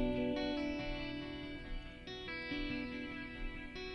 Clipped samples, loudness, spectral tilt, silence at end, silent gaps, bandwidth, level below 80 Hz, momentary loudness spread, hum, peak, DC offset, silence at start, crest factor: under 0.1%; -42 LUFS; -6.5 dB/octave; 0 s; none; 10.5 kHz; -50 dBFS; 10 LU; none; -24 dBFS; under 0.1%; 0 s; 16 dB